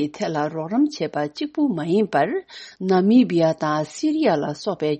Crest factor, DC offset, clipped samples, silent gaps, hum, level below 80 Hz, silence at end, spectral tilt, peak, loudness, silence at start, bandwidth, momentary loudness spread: 16 dB; under 0.1%; under 0.1%; none; none; -66 dBFS; 0 s; -6.5 dB/octave; -6 dBFS; -21 LUFS; 0 s; 8.4 kHz; 10 LU